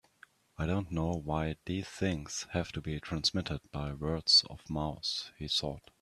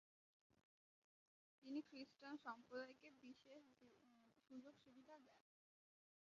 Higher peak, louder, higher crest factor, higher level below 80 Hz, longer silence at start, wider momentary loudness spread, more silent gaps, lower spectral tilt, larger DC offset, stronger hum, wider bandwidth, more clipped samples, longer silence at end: first, -14 dBFS vs -40 dBFS; first, -33 LUFS vs -59 LUFS; about the same, 22 dB vs 22 dB; first, -52 dBFS vs under -90 dBFS; second, 0.6 s vs 1.6 s; about the same, 14 LU vs 14 LU; neither; first, -4 dB/octave vs -2 dB/octave; neither; neither; first, 13 kHz vs 7.2 kHz; neither; second, 0.2 s vs 0.8 s